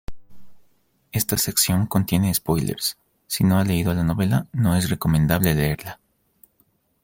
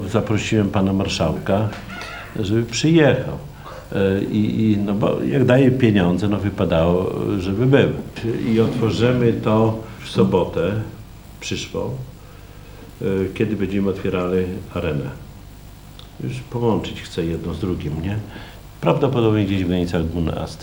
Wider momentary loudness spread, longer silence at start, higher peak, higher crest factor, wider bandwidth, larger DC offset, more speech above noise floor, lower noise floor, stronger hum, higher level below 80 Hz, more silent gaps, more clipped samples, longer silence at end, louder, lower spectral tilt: second, 7 LU vs 15 LU; about the same, 0.1 s vs 0 s; about the same, -2 dBFS vs 0 dBFS; about the same, 20 dB vs 20 dB; second, 17 kHz vs 19.5 kHz; neither; first, 44 dB vs 21 dB; first, -65 dBFS vs -40 dBFS; neither; about the same, -42 dBFS vs -42 dBFS; neither; neither; first, 1.1 s vs 0 s; about the same, -21 LUFS vs -20 LUFS; second, -5 dB/octave vs -7 dB/octave